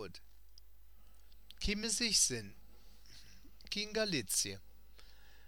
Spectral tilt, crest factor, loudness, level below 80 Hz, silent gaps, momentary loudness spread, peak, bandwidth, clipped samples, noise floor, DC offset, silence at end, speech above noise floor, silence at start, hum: -1.5 dB/octave; 22 dB; -34 LUFS; -54 dBFS; none; 22 LU; -18 dBFS; 19 kHz; under 0.1%; -62 dBFS; 0.2%; 0.35 s; 26 dB; 0 s; none